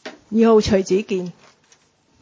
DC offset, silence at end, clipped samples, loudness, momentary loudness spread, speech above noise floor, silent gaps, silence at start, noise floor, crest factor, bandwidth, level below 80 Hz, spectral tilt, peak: under 0.1%; 0.9 s; under 0.1%; -18 LUFS; 12 LU; 41 dB; none; 0.05 s; -57 dBFS; 16 dB; 7.6 kHz; -44 dBFS; -6 dB/octave; -4 dBFS